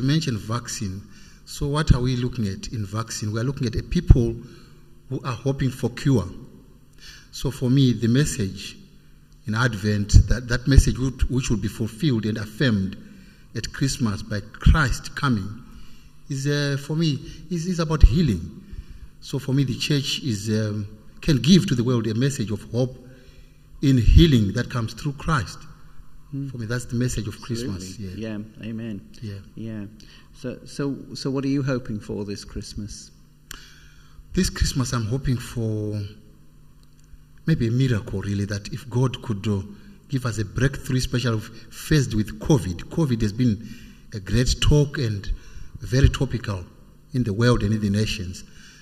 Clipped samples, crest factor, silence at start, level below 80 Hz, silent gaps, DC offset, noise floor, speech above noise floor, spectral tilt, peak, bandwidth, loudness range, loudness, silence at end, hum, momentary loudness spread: under 0.1%; 24 dB; 0 s; -30 dBFS; none; under 0.1%; -49 dBFS; 27 dB; -6 dB/octave; 0 dBFS; 15 kHz; 7 LU; -24 LUFS; 0.1 s; none; 17 LU